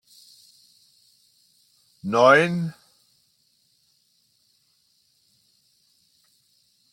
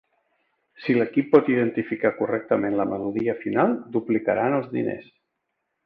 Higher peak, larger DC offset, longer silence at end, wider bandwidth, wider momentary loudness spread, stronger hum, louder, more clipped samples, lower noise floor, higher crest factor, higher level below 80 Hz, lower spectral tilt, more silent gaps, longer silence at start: about the same, -4 dBFS vs -4 dBFS; neither; first, 4.2 s vs 0.8 s; first, 16.5 kHz vs 5.2 kHz; first, 18 LU vs 9 LU; neither; first, -19 LUFS vs -23 LUFS; neither; second, -66 dBFS vs -78 dBFS; about the same, 24 dB vs 20 dB; second, -74 dBFS vs -64 dBFS; second, -5.5 dB/octave vs -10 dB/octave; neither; first, 2.05 s vs 0.8 s